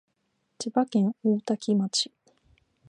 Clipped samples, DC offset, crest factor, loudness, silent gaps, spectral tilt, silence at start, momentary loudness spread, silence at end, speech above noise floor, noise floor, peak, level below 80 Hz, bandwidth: under 0.1%; under 0.1%; 18 dB; -27 LUFS; none; -5 dB/octave; 0.6 s; 6 LU; 0.85 s; 50 dB; -75 dBFS; -10 dBFS; -74 dBFS; 10.5 kHz